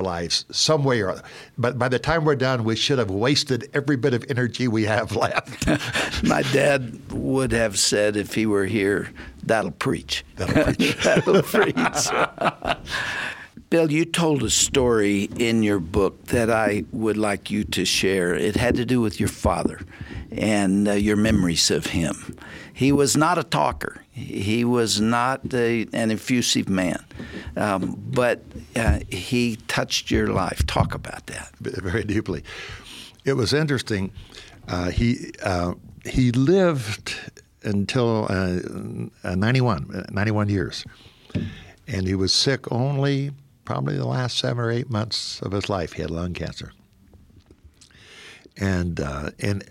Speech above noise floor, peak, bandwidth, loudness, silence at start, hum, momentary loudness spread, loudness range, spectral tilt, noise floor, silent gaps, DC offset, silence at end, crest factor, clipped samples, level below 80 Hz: 30 dB; -6 dBFS; 17 kHz; -22 LUFS; 0 s; none; 14 LU; 5 LU; -4.5 dB/octave; -52 dBFS; none; under 0.1%; 0.05 s; 16 dB; under 0.1%; -40 dBFS